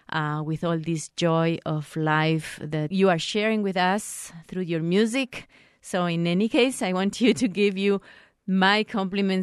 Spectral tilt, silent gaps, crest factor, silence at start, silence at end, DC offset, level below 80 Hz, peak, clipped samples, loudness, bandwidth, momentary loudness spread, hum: -5.5 dB/octave; none; 18 dB; 0.1 s; 0 s; under 0.1%; -64 dBFS; -6 dBFS; under 0.1%; -24 LUFS; 13 kHz; 8 LU; none